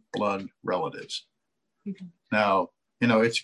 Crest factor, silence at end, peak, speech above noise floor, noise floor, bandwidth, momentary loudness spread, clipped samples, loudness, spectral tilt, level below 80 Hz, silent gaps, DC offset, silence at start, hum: 18 dB; 0 s; -10 dBFS; 54 dB; -81 dBFS; 11.5 kHz; 17 LU; under 0.1%; -27 LUFS; -5 dB/octave; -70 dBFS; none; under 0.1%; 0.15 s; none